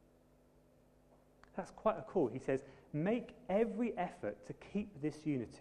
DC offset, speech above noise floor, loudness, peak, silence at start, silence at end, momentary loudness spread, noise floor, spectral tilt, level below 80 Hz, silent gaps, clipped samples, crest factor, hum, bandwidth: under 0.1%; 29 dB; -39 LUFS; -20 dBFS; 1.55 s; 0 s; 9 LU; -68 dBFS; -8 dB/octave; -68 dBFS; none; under 0.1%; 20 dB; none; 11 kHz